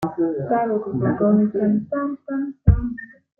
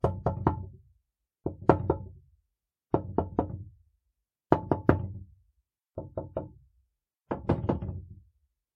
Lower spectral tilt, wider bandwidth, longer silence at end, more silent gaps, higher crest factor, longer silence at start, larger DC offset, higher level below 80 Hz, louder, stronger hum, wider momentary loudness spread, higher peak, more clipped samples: about the same, -11 dB/octave vs -10.5 dB/octave; second, 3 kHz vs 6.8 kHz; second, 0.35 s vs 0.6 s; neither; second, 18 dB vs 32 dB; about the same, 0 s vs 0.05 s; neither; first, -32 dBFS vs -48 dBFS; first, -21 LUFS vs -31 LUFS; neither; second, 9 LU vs 20 LU; about the same, -2 dBFS vs 0 dBFS; neither